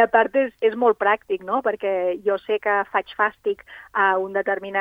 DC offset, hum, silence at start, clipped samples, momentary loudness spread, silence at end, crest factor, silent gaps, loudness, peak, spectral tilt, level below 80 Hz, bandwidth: under 0.1%; none; 0 s; under 0.1%; 6 LU; 0 s; 18 dB; none; -22 LUFS; -2 dBFS; -6.5 dB/octave; -64 dBFS; 4.9 kHz